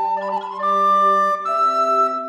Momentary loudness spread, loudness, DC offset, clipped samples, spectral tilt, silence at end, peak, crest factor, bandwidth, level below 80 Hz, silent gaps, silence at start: 8 LU; -17 LUFS; under 0.1%; under 0.1%; -4.5 dB/octave; 0 s; -8 dBFS; 10 dB; 12.5 kHz; -88 dBFS; none; 0 s